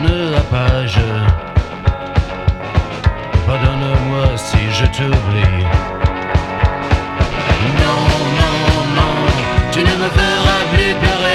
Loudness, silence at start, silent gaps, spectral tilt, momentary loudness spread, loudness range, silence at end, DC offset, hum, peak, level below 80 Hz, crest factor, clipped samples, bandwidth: -15 LUFS; 0 s; none; -6 dB/octave; 5 LU; 3 LU; 0 s; 0.2%; none; 0 dBFS; -20 dBFS; 14 dB; under 0.1%; 12 kHz